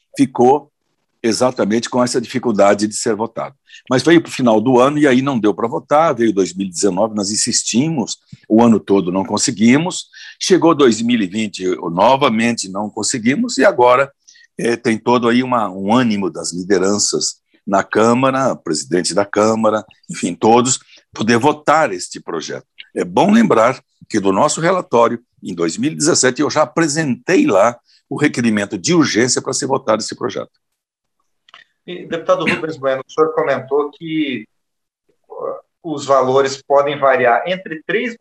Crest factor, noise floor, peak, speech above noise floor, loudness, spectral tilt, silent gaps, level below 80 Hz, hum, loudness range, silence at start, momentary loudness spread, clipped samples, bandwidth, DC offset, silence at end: 14 dB; -76 dBFS; -2 dBFS; 61 dB; -15 LUFS; -4 dB/octave; none; -62 dBFS; none; 5 LU; 0.15 s; 12 LU; under 0.1%; 12 kHz; under 0.1%; 0.05 s